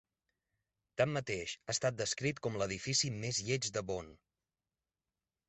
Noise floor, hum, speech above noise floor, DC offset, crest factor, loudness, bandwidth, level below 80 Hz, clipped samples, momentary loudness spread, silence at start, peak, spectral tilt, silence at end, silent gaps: under -90 dBFS; none; over 53 dB; under 0.1%; 22 dB; -36 LUFS; 8.4 kHz; -66 dBFS; under 0.1%; 8 LU; 0.95 s; -18 dBFS; -3.5 dB/octave; 1.35 s; none